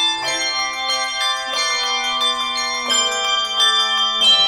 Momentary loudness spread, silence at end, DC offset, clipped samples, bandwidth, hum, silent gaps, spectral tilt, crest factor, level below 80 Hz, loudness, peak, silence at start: 6 LU; 0 s; under 0.1%; under 0.1%; 16 kHz; none; none; 2 dB/octave; 14 dB; -56 dBFS; -17 LUFS; -4 dBFS; 0 s